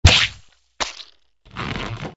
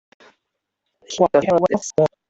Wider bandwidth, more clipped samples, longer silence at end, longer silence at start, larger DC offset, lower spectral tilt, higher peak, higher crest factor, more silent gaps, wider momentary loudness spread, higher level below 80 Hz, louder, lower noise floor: about the same, 8 kHz vs 8.2 kHz; neither; second, 0.05 s vs 0.2 s; second, 0.05 s vs 1.1 s; neither; second, -3 dB/octave vs -5.5 dB/octave; about the same, 0 dBFS vs -2 dBFS; about the same, 22 dB vs 18 dB; neither; first, 23 LU vs 4 LU; first, -28 dBFS vs -58 dBFS; second, -22 LUFS vs -18 LUFS; second, -52 dBFS vs -78 dBFS